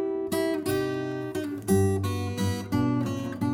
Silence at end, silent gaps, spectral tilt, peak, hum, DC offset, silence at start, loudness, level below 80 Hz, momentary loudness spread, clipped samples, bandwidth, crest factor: 0 s; none; -6.5 dB/octave; -12 dBFS; none; under 0.1%; 0 s; -28 LUFS; -56 dBFS; 7 LU; under 0.1%; 17.5 kHz; 16 dB